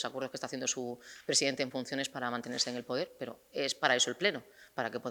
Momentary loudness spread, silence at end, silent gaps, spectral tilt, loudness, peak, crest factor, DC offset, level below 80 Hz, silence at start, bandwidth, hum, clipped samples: 13 LU; 0 s; none; -2 dB/octave; -33 LUFS; -8 dBFS; 26 dB; under 0.1%; -78 dBFS; 0 s; over 20 kHz; none; under 0.1%